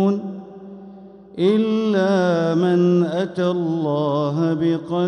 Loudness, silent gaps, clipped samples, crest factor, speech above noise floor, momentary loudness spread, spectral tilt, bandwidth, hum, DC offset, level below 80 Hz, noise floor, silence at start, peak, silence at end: -19 LUFS; none; under 0.1%; 14 dB; 23 dB; 19 LU; -8 dB/octave; 9.2 kHz; none; under 0.1%; -64 dBFS; -41 dBFS; 0 s; -6 dBFS; 0 s